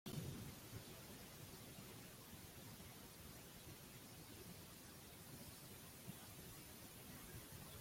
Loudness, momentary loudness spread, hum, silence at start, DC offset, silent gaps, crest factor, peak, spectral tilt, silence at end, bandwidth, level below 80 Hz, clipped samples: -56 LUFS; 3 LU; none; 0.05 s; under 0.1%; none; 20 dB; -36 dBFS; -4 dB/octave; 0 s; 16.5 kHz; -72 dBFS; under 0.1%